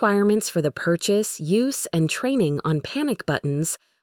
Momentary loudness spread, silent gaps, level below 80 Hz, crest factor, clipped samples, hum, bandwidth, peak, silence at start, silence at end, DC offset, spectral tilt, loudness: 4 LU; none; -60 dBFS; 14 dB; under 0.1%; none; 19 kHz; -8 dBFS; 0 s; 0.25 s; under 0.1%; -5 dB/octave; -23 LUFS